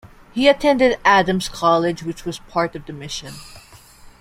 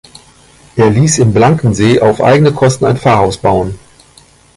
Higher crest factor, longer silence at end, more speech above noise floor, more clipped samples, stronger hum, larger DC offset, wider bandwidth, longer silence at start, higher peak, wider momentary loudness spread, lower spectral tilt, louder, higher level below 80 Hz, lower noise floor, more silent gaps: first, 18 dB vs 10 dB; second, 0.1 s vs 0.8 s; second, 26 dB vs 35 dB; neither; neither; neither; first, 16 kHz vs 11.5 kHz; second, 0.35 s vs 0.75 s; about the same, -2 dBFS vs 0 dBFS; first, 15 LU vs 6 LU; second, -4.5 dB/octave vs -6 dB/octave; second, -18 LUFS vs -10 LUFS; second, -46 dBFS vs -36 dBFS; about the same, -44 dBFS vs -43 dBFS; neither